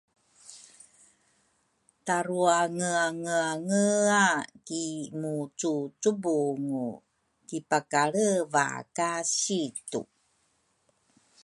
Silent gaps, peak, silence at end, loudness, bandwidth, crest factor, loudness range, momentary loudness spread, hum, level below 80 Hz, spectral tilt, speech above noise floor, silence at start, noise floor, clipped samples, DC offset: none; -8 dBFS; 1.4 s; -28 LUFS; 11.5 kHz; 22 dB; 4 LU; 14 LU; none; -78 dBFS; -3.5 dB/octave; 44 dB; 0.5 s; -72 dBFS; under 0.1%; under 0.1%